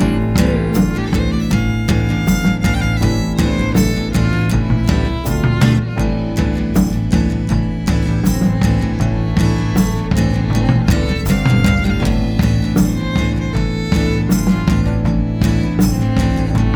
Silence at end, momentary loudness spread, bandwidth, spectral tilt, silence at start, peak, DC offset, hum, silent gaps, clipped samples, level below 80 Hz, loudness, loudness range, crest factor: 0 s; 3 LU; over 20 kHz; -6.5 dB/octave; 0 s; 0 dBFS; under 0.1%; none; none; under 0.1%; -22 dBFS; -16 LUFS; 1 LU; 14 dB